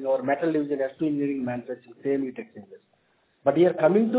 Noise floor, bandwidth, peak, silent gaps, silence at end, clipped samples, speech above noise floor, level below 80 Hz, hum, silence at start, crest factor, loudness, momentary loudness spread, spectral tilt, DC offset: -67 dBFS; 4 kHz; -8 dBFS; none; 0 s; under 0.1%; 42 dB; -70 dBFS; none; 0 s; 18 dB; -25 LUFS; 13 LU; -11.5 dB/octave; under 0.1%